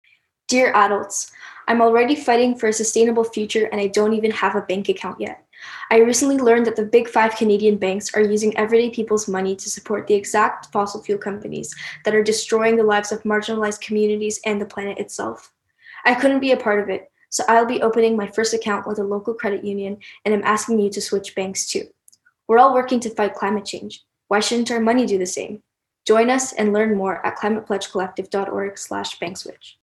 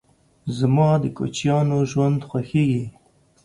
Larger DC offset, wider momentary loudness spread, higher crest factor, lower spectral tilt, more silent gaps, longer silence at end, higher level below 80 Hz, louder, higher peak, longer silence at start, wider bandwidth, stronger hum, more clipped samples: neither; first, 13 LU vs 10 LU; about the same, 18 dB vs 16 dB; second, -3.5 dB/octave vs -7.5 dB/octave; neither; second, 0.15 s vs 0.55 s; second, -64 dBFS vs -54 dBFS; about the same, -19 LUFS vs -21 LUFS; first, -2 dBFS vs -6 dBFS; about the same, 0.5 s vs 0.45 s; first, 12.5 kHz vs 11 kHz; neither; neither